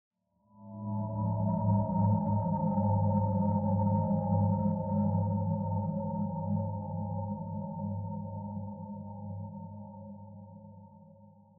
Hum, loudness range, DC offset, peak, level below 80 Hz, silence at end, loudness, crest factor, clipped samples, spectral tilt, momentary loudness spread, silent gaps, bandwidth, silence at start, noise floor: none; 12 LU; under 0.1%; -16 dBFS; -58 dBFS; 0.3 s; -32 LUFS; 16 dB; under 0.1%; -12.5 dB/octave; 18 LU; none; 1.7 kHz; 0.55 s; -63 dBFS